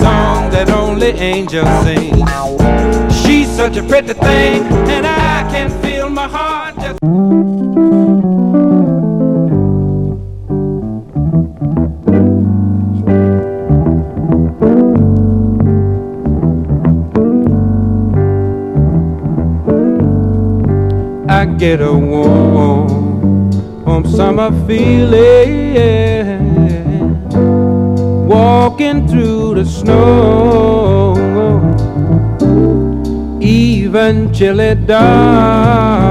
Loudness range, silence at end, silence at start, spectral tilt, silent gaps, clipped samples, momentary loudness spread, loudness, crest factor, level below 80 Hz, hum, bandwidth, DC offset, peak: 3 LU; 0 s; 0 s; -7.5 dB/octave; none; 0.3%; 7 LU; -11 LUFS; 10 dB; -22 dBFS; none; 12 kHz; under 0.1%; 0 dBFS